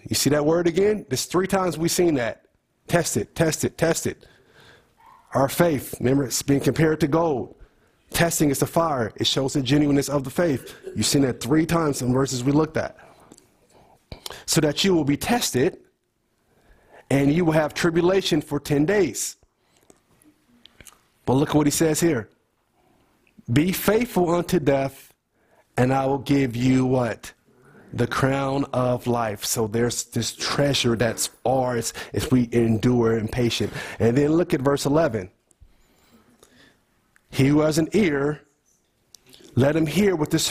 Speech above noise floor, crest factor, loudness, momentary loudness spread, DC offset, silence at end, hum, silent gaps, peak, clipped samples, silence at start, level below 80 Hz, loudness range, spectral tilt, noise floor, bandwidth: 49 dB; 18 dB; -22 LUFS; 8 LU; under 0.1%; 0 s; none; none; -4 dBFS; under 0.1%; 0.05 s; -48 dBFS; 3 LU; -5 dB/octave; -70 dBFS; 16 kHz